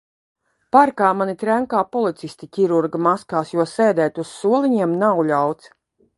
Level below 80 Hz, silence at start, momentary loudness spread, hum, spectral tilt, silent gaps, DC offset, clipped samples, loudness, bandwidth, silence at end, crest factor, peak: -66 dBFS; 0.75 s; 8 LU; none; -6.5 dB/octave; none; under 0.1%; under 0.1%; -19 LUFS; 11.5 kHz; 0.65 s; 18 dB; 0 dBFS